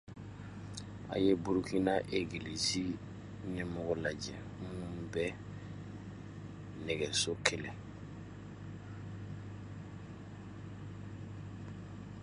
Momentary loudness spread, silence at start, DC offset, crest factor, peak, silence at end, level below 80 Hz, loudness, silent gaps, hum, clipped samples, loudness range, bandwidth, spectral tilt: 16 LU; 0.05 s; under 0.1%; 32 dB; -8 dBFS; 0 s; -58 dBFS; -39 LUFS; none; none; under 0.1%; 12 LU; 11.5 kHz; -4.5 dB/octave